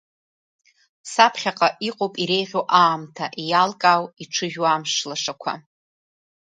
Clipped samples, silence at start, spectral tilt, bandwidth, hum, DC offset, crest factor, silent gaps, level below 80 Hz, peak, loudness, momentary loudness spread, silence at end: under 0.1%; 1.05 s; -3 dB/octave; 9.4 kHz; none; under 0.1%; 22 dB; none; -74 dBFS; 0 dBFS; -21 LUFS; 12 LU; 0.9 s